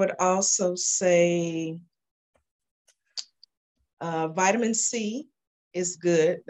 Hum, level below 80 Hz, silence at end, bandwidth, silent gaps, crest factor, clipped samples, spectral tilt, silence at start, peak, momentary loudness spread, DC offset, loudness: none; -76 dBFS; 0.1 s; 9.4 kHz; 2.11-2.33 s, 2.51-2.59 s, 2.71-2.85 s, 3.57-3.75 s, 3.93-3.97 s, 5.47-5.71 s; 18 dB; under 0.1%; -3.5 dB/octave; 0 s; -8 dBFS; 16 LU; under 0.1%; -24 LUFS